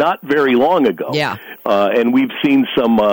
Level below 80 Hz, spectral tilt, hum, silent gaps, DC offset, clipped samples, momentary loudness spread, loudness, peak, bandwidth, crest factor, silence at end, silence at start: -56 dBFS; -6.5 dB/octave; none; none; under 0.1%; under 0.1%; 6 LU; -15 LUFS; -4 dBFS; 17 kHz; 10 dB; 0 s; 0 s